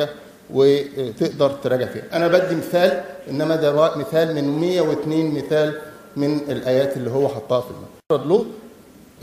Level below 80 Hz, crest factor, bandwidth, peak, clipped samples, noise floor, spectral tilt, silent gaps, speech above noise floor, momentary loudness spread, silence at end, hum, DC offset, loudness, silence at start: -60 dBFS; 20 dB; 15.5 kHz; -2 dBFS; under 0.1%; -46 dBFS; -6.5 dB/octave; none; 26 dB; 10 LU; 0.55 s; none; under 0.1%; -20 LUFS; 0 s